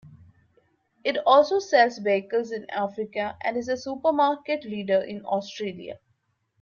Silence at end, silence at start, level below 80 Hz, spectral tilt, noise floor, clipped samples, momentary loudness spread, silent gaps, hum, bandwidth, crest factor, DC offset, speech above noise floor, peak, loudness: 0.65 s; 0.05 s; -70 dBFS; -4.5 dB/octave; -71 dBFS; under 0.1%; 12 LU; none; none; 7.2 kHz; 20 dB; under 0.1%; 47 dB; -6 dBFS; -25 LUFS